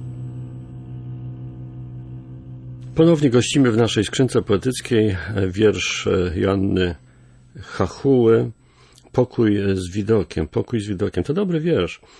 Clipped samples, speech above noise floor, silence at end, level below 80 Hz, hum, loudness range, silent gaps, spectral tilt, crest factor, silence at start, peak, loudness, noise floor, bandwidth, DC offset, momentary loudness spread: under 0.1%; 32 dB; 0.25 s; -44 dBFS; none; 3 LU; none; -6 dB/octave; 16 dB; 0 s; -4 dBFS; -19 LUFS; -50 dBFS; 11 kHz; under 0.1%; 19 LU